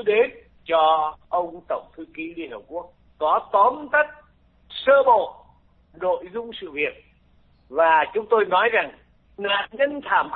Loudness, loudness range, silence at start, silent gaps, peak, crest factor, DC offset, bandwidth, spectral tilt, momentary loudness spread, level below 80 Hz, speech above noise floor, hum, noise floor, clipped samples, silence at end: -22 LUFS; 3 LU; 0 s; none; -6 dBFS; 16 dB; under 0.1%; 4.6 kHz; -7.5 dB/octave; 16 LU; -60 dBFS; 36 dB; none; -57 dBFS; under 0.1%; 0 s